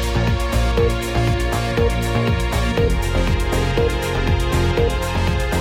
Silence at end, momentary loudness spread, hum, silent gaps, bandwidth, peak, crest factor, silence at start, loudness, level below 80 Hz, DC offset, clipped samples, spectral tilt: 0 s; 2 LU; none; none; 16.5 kHz; -4 dBFS; 14 dB; 0 s; -19 LUFS; -22 dBFS; under 0.1%; under 0.1%; -5.5 dB/octave